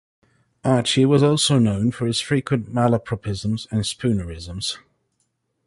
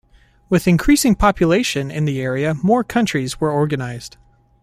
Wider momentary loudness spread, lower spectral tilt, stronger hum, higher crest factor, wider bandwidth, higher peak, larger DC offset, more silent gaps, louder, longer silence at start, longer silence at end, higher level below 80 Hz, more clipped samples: first, 11 LU vs 8 LU; about the same, -5.5 dB/octave vs -5.5 dB/octave; neither; about the same, 16 dB vs 16 dB; second, 11.5 kHz vs 15.5 kHz; second, -6 dBFS vs -2 dBFS; neither; neither; second, -21 LUFS vs -17 LUFS; first, 0.65 s vs 0.5 s; first, 0.9 s vs 0.55 s; second, -46 dBFS vs -36 dBFS; neither